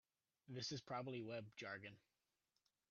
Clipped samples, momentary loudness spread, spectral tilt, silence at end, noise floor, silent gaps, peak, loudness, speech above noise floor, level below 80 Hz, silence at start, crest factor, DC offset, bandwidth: under 0.1%; 7 LU; -3.5 dB/octave; 0.9 s; -90 dBFS; none; -36 dBFS; -51 LUFS; 39 dB; -88 dBFS; 0.5 s; 18 dB; under 0.1%; 7 kHz